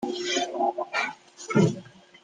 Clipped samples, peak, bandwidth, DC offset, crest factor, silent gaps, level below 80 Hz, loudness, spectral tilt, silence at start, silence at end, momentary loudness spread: under 0.1%; -8 dBFS; 9.8 kHz; under 0.1%; 20 dB; none; -72 dBFS; -26 LUFS; -5 dB/octave; 0 s; 0.35 s; 11 LU